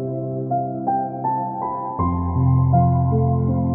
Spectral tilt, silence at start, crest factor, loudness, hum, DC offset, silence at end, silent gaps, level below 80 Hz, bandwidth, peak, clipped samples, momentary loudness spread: -16 dB/octave; 0 s; 14 dB; -21 LUFS; none; under 0.1%; 0 s; none; -38 dBFS; 2.2 kHz; -6 dBFS; under 0.1%; 9 LU